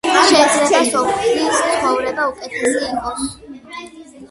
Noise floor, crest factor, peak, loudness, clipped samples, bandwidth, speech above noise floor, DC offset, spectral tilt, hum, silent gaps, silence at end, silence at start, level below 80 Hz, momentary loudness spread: -37 dBFS; 16 dB; 0 dBFS; -16 LUFS; under 0.1%; 11.5 kHz; 20 dB; under 0.1%; -2 dB/octave; none; none; 0.05 s; 0.05 s; -50 dBFS; 21 LU